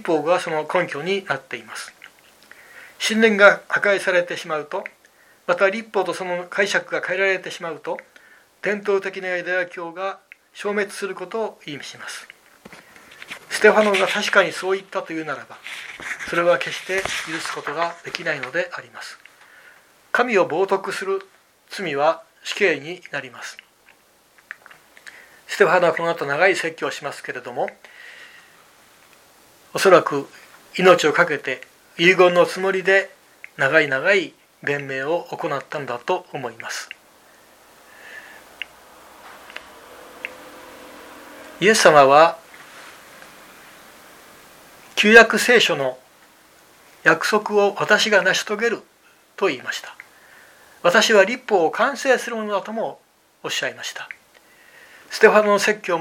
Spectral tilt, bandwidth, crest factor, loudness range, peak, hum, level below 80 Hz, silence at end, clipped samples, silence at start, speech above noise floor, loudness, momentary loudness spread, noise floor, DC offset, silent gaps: -3 dB/octave; 16.5 kHz; 22 dB; 11 LU; 0 dBFS; none; -66 dBFS; 0 s; under 0.1%; 0 s; 36 dB; -19 LUFS; 22 LU; -55 dBFS; under 0.1%; none